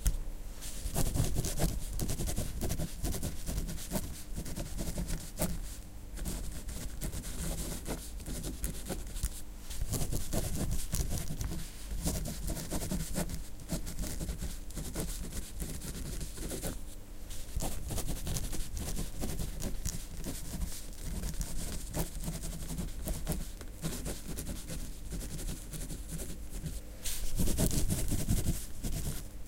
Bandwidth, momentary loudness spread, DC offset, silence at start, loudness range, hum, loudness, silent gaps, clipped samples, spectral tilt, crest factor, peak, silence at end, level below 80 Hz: 17 kHz; 9 LU; under 0.1%; 0 s; 5 LU; none; -39 LUFS; none; under 0.1%; -4.5 dB/octave; 22 dB; -14 dBFS; 0 s; -38 dBFS